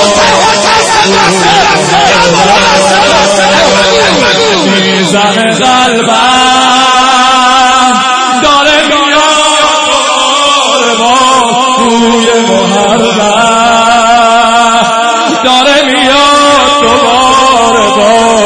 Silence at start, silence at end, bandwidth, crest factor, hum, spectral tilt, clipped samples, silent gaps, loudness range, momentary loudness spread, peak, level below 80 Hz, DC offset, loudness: 0 s; 0 s; 11 kHz; 6 dB; none; -2.5 dB/octave; 3%; none; 1 LU; 2 LU; 0 dBFS; -36 dBFS; under 0.1%; -5 LUFS